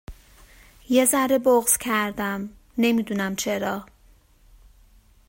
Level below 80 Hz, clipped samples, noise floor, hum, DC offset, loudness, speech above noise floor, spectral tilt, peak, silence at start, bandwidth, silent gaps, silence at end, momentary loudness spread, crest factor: -52 dBFS; under 0.1%; -55 dBFS; none; under 0.1%; -22 LUFS; 33 dB; -3.5 dB/octave; -6 dBFS; 0.1 s; 16.5 kHz; none; 1.45 s; 11 LU; 18 dB